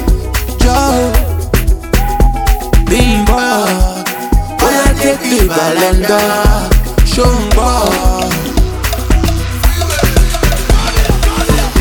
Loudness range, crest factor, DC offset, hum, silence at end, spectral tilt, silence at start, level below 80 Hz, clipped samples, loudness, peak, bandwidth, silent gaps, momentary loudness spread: 2 LU; 10 dB; under 0.1%; none; 0 s; -4.5 dB/octave; 0 s; -12 dBFS; under 0.1%; -12 LUFS; 0 dBFS; over 20 kHz; none; 5 LU